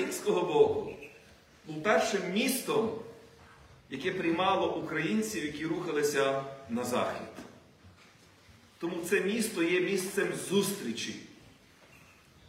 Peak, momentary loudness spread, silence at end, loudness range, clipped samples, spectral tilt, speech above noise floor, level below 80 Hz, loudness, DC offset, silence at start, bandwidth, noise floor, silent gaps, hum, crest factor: -12 dBFS; 15 LU; 1 s; 4 LU; under 0.1%; -4 dB/octave; 28 dB; -68 dBFS; -31 LUFS; under 0.1%; 0 s; 16 kHz; -59 dBFS; none; none; 20 dB